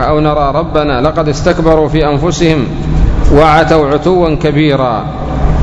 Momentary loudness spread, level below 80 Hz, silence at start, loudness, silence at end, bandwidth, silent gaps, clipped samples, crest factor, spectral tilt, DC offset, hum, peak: 7 LU; -18 dBFS; 0 s; -10 LUFS; 0 s; 8.4 kHz; none; 2%; 10 dB; -6.5 dB/octave; under 0.1%; none; 0 dBFS